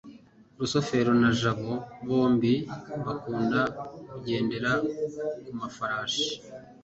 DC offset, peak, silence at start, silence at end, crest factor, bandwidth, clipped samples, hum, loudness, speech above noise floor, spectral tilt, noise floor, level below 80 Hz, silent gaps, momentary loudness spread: under 0.1%; -12 dBFS; 0.05 s; 0.1 s; 16 dB; 8 kHz; under 0.1%; none; -28 LUFS; 25 dB; -5.5 dB/octave; -53 dBFS; -60 dBFS; none; 13 LU